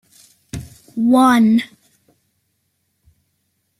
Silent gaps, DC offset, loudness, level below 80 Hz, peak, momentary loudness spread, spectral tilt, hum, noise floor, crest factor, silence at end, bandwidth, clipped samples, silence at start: none; under 0.1%; -14 LUFS; -52 dBFS; -2 dBFS; 22 LU; -5.5 dB/octave; none; -69 dBFS; 16 dB; 2.15 s; 15 kHz; under 0.1%; 0.55 s